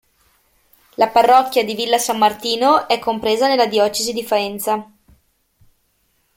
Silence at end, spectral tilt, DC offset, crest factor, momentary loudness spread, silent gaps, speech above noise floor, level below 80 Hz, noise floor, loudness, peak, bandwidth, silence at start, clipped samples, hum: 1.5 s; -2.5 dB/octave; under 0.1%; 18 dB; 8 LU; none; 48 dB; -58 dBFS; -64 dBFS; -16 LUFS; -2 dBFS; 16.5 kHz; 1 s; under 0.1%; none